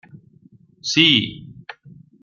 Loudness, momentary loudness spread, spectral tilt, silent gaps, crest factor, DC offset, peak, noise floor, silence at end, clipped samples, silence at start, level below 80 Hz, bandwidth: -16 LUFS; 26 LU; -3 dB/octave; none; 22 dB; under 0.1%; -2 dBFS; -52 dBFS; 0.35 s; under 0.1%; 0.15 s; -60 dBFS; 7.4 kHz